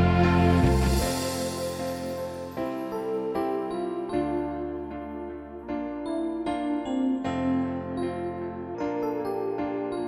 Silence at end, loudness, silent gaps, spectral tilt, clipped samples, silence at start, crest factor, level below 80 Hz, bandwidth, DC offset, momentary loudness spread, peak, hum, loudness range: 0 s; -28 LUFS; none; -6.5 dB/octave; under 0.1%; 0 s; 20 dB; -38 dBFS; 16.5 kHz; under 0.1%; 13 LU; -8 dBFS; none; 4 LU